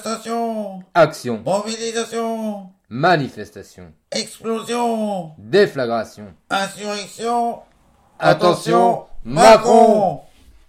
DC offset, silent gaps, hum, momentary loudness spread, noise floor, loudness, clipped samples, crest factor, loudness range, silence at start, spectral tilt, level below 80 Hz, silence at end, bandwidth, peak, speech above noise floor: under 0.1%; none; none; 16 LU; -55 dBFS; -18 LUFS; under 0.1%; 18 dB; 8 LU; 0 s; -4.5 dB/octave; -48 dBFS; 0.45 s; 15.5 kHz; 0 dBFS; 37 dB